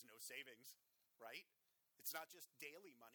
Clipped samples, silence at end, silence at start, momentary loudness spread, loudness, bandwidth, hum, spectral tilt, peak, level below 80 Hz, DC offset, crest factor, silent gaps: under 0.1%; 0 s; 0 s; 13 LU; -55 LUFS; over 20 kHz; none; 0 dB/octave; -34 dBFS; under -90 dBFS; under 0.1%; 26 dB; none